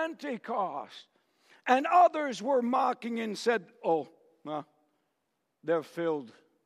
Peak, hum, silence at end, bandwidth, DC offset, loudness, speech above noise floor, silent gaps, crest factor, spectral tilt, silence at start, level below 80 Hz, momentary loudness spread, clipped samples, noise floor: -10 dBFS; none; 0.35 s; 13 kHz; under 0.1%; -30 LUFS; 51 dB; none; 22 dB; -5 dB/octave; 0 s; under -90 dBFS; 16 LU; under 0.1%; -81 dBFS